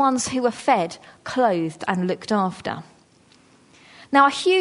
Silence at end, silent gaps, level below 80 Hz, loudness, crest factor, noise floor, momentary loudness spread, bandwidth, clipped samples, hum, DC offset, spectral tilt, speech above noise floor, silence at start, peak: 0 s; none; -64 dBFS; -21 LUFS; 18 dB; -55 dBFS; 14 LU; 11 kHz; under 0.1%; none; under 0.1%; -4.5 dB/octave; 34 dB; 0 s; -4 dBFS